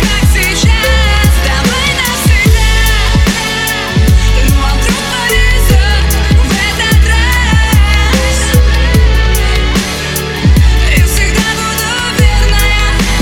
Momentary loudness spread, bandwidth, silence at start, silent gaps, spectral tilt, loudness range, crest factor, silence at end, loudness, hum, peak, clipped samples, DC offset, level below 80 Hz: 3 LU; 18 kHz; 0 s; none; -4 dB/octave; 1 LU; 8 dB; 0 s; -10 LUFS; none; 0 dBFS; under 0.1%; under 0.1%; -10 dBFS